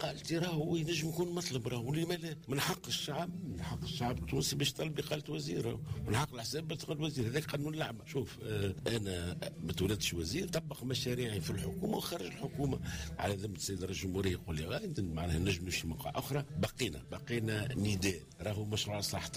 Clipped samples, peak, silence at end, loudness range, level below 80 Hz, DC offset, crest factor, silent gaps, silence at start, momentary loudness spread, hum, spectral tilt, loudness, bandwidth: under 0.1%; -22 dBFS; 0 s; 1 LU; -56 dBFS; under 0.1%; 14 dB; none; 0 s; 6 LU; none; -4.5 dB/octave; -37 LUFS; 15.5 kHz